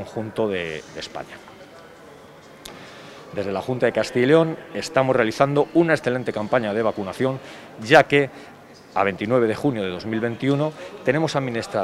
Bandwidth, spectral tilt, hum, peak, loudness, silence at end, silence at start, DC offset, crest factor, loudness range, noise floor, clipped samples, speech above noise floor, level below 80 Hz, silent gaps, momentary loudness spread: 14.5 kHz; -6 dB/octave; none; 0 dBFS; -21 LUFS; 0 s; 0 s; under 0.1%; 22 dB; 10 LU; -45 dBFS; under 0.1%; 23 dB; -60 dBFS; none; 20 LU